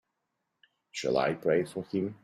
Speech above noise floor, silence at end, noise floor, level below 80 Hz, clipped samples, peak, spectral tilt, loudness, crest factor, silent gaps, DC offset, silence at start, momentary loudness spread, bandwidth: 53 dB; 0.1 s; -82 dBFS; -70 dBFS; under 0.1%; -14 dBFS; -5.5 dB/octave; -30 LUFS; 18 dB; none; under 0.1%; 0.95 s; 7 LU; 15 kHz